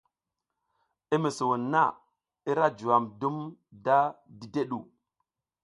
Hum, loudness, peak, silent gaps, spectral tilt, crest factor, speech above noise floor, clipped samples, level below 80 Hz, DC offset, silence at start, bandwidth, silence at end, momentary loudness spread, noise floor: none; -28 LUFS; -8 dBFS; none; -6 dB/octave; 22 dB; 59 dB; under 0.1%; -74 dBFS; under 0.1%; 1.1 s; 11.5 kHz; 0.8 s; 13 LU; -87 dBFS